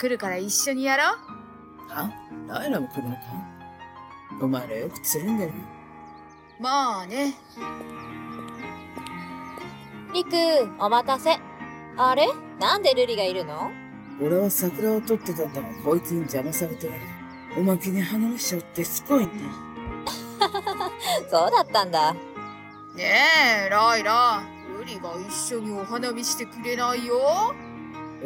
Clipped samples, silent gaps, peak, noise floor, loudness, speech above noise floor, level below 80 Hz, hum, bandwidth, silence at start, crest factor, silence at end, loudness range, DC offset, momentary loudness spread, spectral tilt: under 0.1%; none; -6 dBFS; -47 dBFS; -24 LUFS; 23 dB; -58 dBFS; none; 17 kHz; 0 s; 18 dB; 0 s; 10 LU; under 0.1%; 19 LU; -3.5 dB/octave